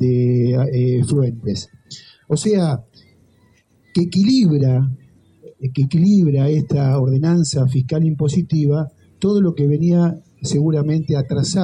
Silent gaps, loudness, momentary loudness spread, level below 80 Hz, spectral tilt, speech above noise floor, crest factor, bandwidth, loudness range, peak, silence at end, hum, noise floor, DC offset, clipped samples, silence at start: none; -17 LUFS; 11 LU; -52 dBFS; -7.5 dB/octave; 39 dB; 12 dB; 10.5 kHz; 4 LU; -6 dBFS; 0 s; none; -56 dBFS; under 0.1%; under 0.1%; 0 s